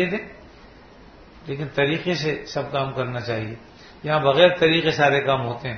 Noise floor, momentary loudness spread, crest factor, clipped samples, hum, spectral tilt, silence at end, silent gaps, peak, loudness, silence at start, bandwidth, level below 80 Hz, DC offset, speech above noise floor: -46 dBFS; 18 LU; 20 dB; under 0.1%; none; -5.5 dB/octave; 0 s; none; -4 dBFS; -21 LUFS; 0 s; 6.6 kHz; -52 dBFS; under 0.1%; 25 dB